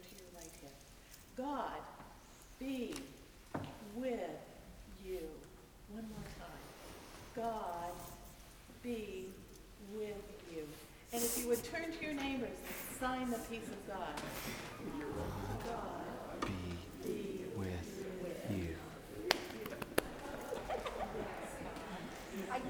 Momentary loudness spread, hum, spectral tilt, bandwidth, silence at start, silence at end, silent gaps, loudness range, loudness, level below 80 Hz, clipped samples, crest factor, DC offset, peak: 16 LU; none; -4 dB/octave; over 20 kHz; 0 s; 0 s; none; 7 LU; -44 LUFS; -58 dBFS; under 0.1%; 36 dB; under 0.1%; -8 dBFS